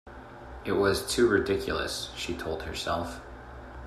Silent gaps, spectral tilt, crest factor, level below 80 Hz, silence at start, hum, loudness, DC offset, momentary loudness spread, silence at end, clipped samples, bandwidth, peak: none; -4 dB/octave; 20 dB; -48 dBFS; 0.05 s; none; -29 LUFS; under 0.1%; 21 LU; 0 s; under 0.1%; 15 kHz; -10 dBFS